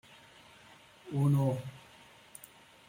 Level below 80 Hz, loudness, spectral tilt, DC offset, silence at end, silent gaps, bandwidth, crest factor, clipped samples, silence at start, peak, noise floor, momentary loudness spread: -70 dBFS; -31 LUFS; -8 dB/octave; under 0.1%; 1.1 s; none; 16.5 kHz; 16 dB; under 0.1%; 1.05 s; -20 dBFS; -58 dBFS; 27 LU